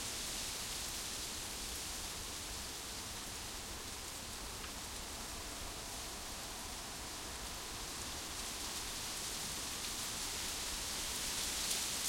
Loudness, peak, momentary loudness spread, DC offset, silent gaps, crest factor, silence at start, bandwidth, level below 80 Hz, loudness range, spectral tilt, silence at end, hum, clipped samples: -41 LUFS; -24 dBFS; 6 LU; under 0.1%; none; 20 dB; 0 s; 16.5 kHz; -54 dBFS; 5 LU; -1 dB/octave; 0 s; none; under 0.1%